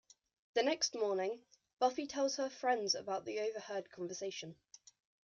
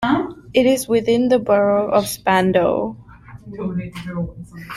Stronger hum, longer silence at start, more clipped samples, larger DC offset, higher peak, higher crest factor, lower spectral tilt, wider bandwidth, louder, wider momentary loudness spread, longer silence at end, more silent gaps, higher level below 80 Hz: neither; first, 0.55 s vs 0 s; neither; neither; second, -20 dBFS vs -2 dBFS; about the same, 18 dB vs 16 dB; second, -2 dB/octave vs -5.5 dB/octave; second, 10.5 kHz vs 15.5 kHz; second, -38 LUFS vs -18 LUFS; about the same, 11 LU vs 13 LU; first, 0.75 s vs 0 s; first, 1.73-1.77 s vs none; second, -84 dBFS vs -48 dBFS